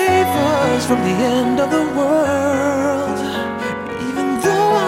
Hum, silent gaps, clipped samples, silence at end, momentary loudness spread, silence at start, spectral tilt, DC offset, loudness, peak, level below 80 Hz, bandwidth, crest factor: none; none; under 0.1%; 0 s; 7 LU; 0 s; -5 dB/octave; under 0.1%; -17 LUFS; -4 dBFS; -50 dBFS; 16.5 kHz; 12 dB